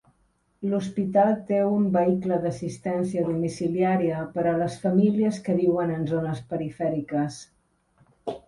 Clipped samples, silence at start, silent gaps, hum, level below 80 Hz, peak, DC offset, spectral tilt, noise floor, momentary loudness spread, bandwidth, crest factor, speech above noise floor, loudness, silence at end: under 0.1%; 0.6 s; none; none; -60 dBFS; -10 dBFS; under 0.1%; -8 dB/octave; -68 dBFS; 9 LU; 11.5 kHz; 16 dB; 43 dB; -25 LUFS; 0.1 s